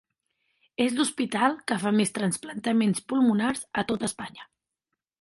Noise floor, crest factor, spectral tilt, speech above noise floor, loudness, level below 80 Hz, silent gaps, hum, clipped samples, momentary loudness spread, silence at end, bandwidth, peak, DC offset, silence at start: -84 dBFS; 18 dB; -4.5 dB/octave; 59 dB; -26 LUFS; -66 dBFS; none; none; under 0.1%; 7 LU; 0.75 s; 11.5 kHz; -8 dBFS; under 0.1%; 0.8 s